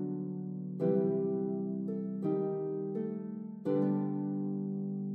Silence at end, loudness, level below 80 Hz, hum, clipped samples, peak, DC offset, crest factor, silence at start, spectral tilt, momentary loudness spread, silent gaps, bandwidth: 0 s; -35 LUFS; -86 dBFS; none; under 0.1%; -18 dBFS; under 0.1%; 16 dB; 0 s; -12 dB/octave; 8 LU; none; 3.6 kHz